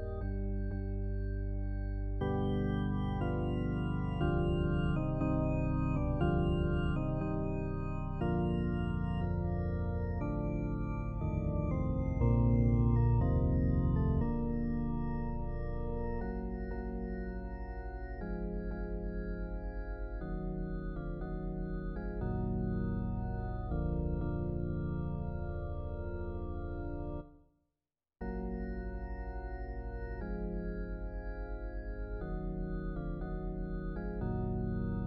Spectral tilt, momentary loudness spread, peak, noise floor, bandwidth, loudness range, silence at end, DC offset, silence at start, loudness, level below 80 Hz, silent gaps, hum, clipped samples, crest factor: -10.5 dB/octave; 11 LU; -18 dBFS; under -90 dBFS; 4.4 kHz; 10 LU; 0 s; under 0.1%; 0 s; -36 LUFS; -40 dBFS; none; none; under 0.1%; 16 dB